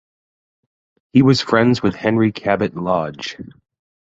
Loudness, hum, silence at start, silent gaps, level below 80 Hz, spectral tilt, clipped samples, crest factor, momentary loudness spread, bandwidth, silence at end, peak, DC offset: -17 LUFS; none; 1.15 s; none; -50 dBFS; -6.5 dB/octave; under 0.1%; 18 dB; 14 LU; 8 kHz; 0.6 s; -2 dBFS; under 0.1%